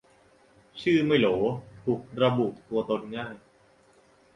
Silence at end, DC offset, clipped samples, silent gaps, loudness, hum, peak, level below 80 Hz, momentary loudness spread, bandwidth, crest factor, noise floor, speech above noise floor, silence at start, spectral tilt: 1 s; under 0.1%; under 0.1%; none; -27 LUFS; none; -8 dBFS; -62 dBFS; 14 LU; 10 kHz; 20 dB; -60 dBFS; 34 dB; 0.75 s; -7.5 dB/octave